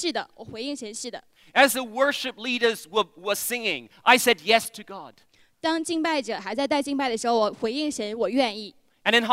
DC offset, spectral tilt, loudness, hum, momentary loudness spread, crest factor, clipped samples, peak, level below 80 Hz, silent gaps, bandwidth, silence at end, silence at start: under 0.1%; -2 dB/octave; -24 LUFS; none; 15 LU; 24 dB; under 0.1%; -2 dBFS; -68 dBFS; none; 16 kHz; 0 s; 0 s